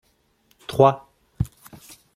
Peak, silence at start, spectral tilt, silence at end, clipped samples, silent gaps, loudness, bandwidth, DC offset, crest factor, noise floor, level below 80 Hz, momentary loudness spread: -2 dBFS; 0.7 s; -7 dB/octave; 0.7 s; under 0.1%; none; -22 LUFS; 16 kHz; under 0.1%; 22 dB; -64 dBFS; -46 dBFS; 22 LU